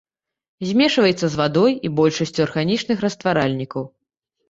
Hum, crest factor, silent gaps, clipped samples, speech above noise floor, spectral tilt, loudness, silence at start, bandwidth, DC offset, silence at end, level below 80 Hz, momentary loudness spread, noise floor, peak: none; 16 dB; none; under 0.1%; 57 dB; -5.5 dB/octave; -19 LUFS; 0.6 s; 8 kHz; under 0.1%; 0.6 s; -56 dBFS; 11 LU; -75 dBFS; -4 dBFS